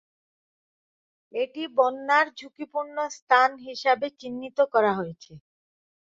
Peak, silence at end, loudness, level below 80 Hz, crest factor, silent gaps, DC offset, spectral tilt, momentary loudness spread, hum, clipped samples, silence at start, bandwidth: -6 dBFS; 0.75 s; -25 LUFS; -74 dBFS; 22 dB; 3.22-3.27 s; under 0.1%; -4 dB/octave; 13 LU; none; under 0.1%; 1.35 s; 7.8 kHz